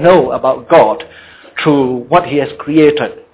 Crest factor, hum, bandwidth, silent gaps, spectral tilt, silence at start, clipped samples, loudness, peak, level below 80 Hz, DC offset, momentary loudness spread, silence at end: 12 dB; none; 4 kHz; none; -10.5 dB/octave; 0 s; 0.6%; -12 LUFS; 0 dBFS; -46 dBFS; under 0.1%; 10 LU; 0.2 s